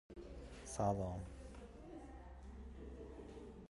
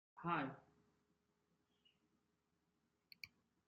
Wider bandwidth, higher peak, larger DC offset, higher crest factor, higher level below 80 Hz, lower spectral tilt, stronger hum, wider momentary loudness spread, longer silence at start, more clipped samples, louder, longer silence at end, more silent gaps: first, 11.5 kHz vs 6.8 kHz; about the same, -26 dBFS vs -28 dBFS; neither; about the same, 22 dB vs 24 dB; first, -56 dBFS vs -88 dBFS; first, -6.5 dB/octave vs -4.5 dB/octave; neither; second, 16 LU vs 20 LU; about the same, 0.1 s vs 0.15 s; neither; second, -48 LUFS vs -45 LUFS; second, 0 s vs 0.4 s; neither